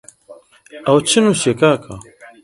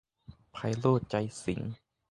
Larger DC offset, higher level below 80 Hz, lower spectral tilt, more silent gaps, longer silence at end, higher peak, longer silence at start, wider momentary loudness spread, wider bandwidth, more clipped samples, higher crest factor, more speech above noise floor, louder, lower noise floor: neither; about the same, -54 dBFS vs -58 dBFS; second, -4 dB/octave vs -7 dB/octave; neither; about the same, 0.45 s vs 0.35 s; first, 0 dBFS vs -10 dBFS; about the same, 0.3 s vs 0.3 s; about the same, 18 LU vs 17 LU; about the same, 11.5 kHz vs 11.5 kHz; neither; second, 16 dB vs 22 dB; about the same, 28 dB vs 25 dB; first, -15 LUFS vs -32 LUFS; second, -43 dBFS vs -55 dBFS